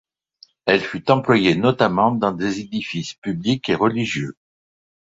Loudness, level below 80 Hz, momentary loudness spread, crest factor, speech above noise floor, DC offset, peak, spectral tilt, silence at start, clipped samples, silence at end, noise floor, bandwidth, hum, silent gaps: -20 LUFS; -54 dBFS; 10 LU; 20 dB; 34 dB; under 0.1%; 0 dBFS; -6 dB/octave; 0.65 s; under 0.1%; 0.75 s; -53 dBFS; 8 kHz; none; 3.18-3.22 s